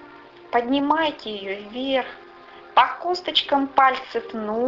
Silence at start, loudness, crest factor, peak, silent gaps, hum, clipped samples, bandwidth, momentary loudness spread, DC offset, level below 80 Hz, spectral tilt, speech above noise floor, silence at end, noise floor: 0 s; -22 LUFS; 20 dB; -2 dBFS; none; none; under 0.1%; 7.6 kHz; 12 LU; under 0.1%; -62 dBFS; -4.5 dB/octave; 23 dB; 0 s; -45 dBFS